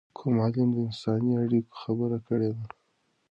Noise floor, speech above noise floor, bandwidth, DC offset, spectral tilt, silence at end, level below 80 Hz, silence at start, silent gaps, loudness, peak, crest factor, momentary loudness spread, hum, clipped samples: -73 dBFS; 46 dB; 8 kHz; under 0.1%; -9.5 dB/octave; 0.65 s; -64 dBFS; 0.2 s; none; -28 LUFS; -14 dBFS; 14 dB; 7 LU; none; under 0.1%